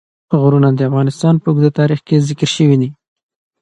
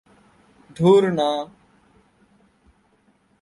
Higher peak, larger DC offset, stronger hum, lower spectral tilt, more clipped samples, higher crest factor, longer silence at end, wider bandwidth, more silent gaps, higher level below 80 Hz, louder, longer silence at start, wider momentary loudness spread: first, 0 dBFS vs -4 dBFS; neither; neither; about the same, -7 dB/octave vs -7 dB/octave; neither; second, 14 dB vs 20 dB; second, 0.7 s vs 1.95 s; second, 9 kHz vs 11.5 kHz; neither; first, -56 dBFS vs -62 dBFS; first, -13 LUFS vs -19 LUFS; second, 0.3 s vs 0.8 s; second, 4 LU vs 14 LU